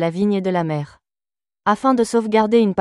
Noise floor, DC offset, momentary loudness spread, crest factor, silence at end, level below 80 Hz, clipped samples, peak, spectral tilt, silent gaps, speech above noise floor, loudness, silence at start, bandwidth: under -90 dBFS; under 0.1%; 9 LU; 16 dB; 0 s; -58 dBFS; under 0.1%; -4 dBFS; -6.5 dB/octave; none; over 73 dB; -18 LUFS; 0 s; 12 kHz